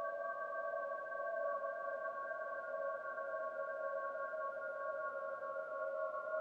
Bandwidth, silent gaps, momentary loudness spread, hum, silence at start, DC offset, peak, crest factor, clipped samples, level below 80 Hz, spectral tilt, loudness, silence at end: 7.2 kHz; none; 3 LU; none; 0 s; under 0.1%; -30 dBFS; 14 dB; under 0.1%; under -90 dBFS; -4.5 dB/octave; -43 LUFS; 0 s